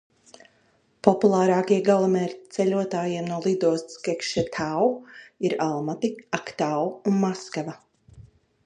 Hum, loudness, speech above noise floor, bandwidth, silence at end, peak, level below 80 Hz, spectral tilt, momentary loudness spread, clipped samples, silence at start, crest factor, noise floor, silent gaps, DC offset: none; -24 LUFS; 40 dB; 10 kHz; 0.45 s; -2 dBFS; -64 dBFS; -6 dB/octave; 10 LU; under 0.1%; 1.05 s; 24 dB; -64 dBFS; none; under 0.1%